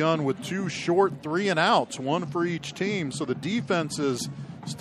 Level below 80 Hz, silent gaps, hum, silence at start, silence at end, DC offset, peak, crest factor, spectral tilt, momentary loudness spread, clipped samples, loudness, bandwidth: -66 dBFS; none; none; 0 s; 0 s; under 0.1%; -8 dBFS; 18 dB; -5 dB/octave; 7 LU; under 0.1%; -26 LUFS; 14 kHz